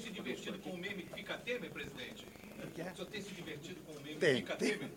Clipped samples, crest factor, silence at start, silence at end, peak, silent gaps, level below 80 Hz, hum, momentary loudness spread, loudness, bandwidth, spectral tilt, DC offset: under 0.1%; 22 dB; 0 s; 0 s; -20 dBFS; none; -70 dBFS; none; 15 LU; -41 LUFS; 17 kHz; -4.5 dB/octave; under 0.1%